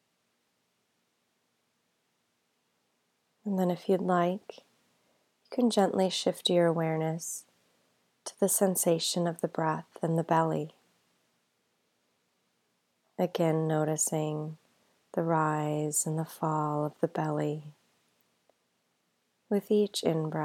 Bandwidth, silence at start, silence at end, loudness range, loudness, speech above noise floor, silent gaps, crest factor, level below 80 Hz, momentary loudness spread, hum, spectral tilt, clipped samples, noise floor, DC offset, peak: 17.5 kHz; 3.45 s; 0 s; 6 LU; -30 LUFS; 47 dB; none; 20 dB; -84 dBFS; 12 LU; none; -5 dB/octave; under 0.1%; -77 dBFS; under 0.1%; -12 dBFS